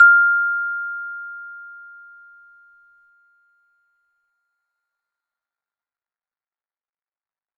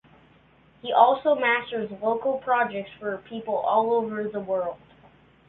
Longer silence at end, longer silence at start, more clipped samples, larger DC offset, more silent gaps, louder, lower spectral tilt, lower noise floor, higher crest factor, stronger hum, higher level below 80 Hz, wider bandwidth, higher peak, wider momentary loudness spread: first, 5.75 s vs 0.75 s; second, 0 s vs 0.85 s; neither; neither; neither; first, -18 LUFS vs -25 LUFS; second, 0 dB/octave vs -8.5 dB/octave; first, under -90 dBFS vs -57 dBFS; about the same, 22 dB vs 22 dB; neither; second, -80 dBFS vs -66 dBFS; second, 3 kHz vs 4.2 kHz; about the same, -2 dBFS vs -4 dBFS; first, 27 LU vs 13 LU